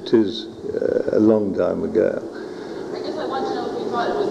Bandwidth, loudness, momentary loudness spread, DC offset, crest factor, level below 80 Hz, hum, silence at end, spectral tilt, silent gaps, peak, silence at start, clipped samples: 9 kHz; -22 LUFS; 13 LU; under 0.1%; 18 dB; -60 dBFS; none; 0 s; -7 dB/octave; none; -4 dBFS; 0 s; under 0.1%